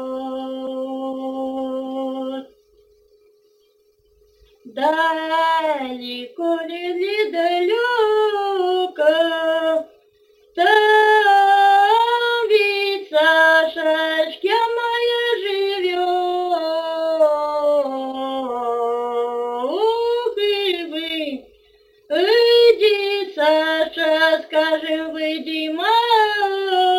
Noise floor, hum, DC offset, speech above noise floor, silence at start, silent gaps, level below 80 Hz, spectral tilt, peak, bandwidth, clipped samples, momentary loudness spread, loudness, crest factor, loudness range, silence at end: -59 dBFS; none; under 0.1%; 39 dB; 0 s; none; -66 dBFS; -2 dB/octave; -2 dBFS; 17 kHz; under 0.1%; 13 LU; -18 LUFS; 16 dB; 10 LU; 0 s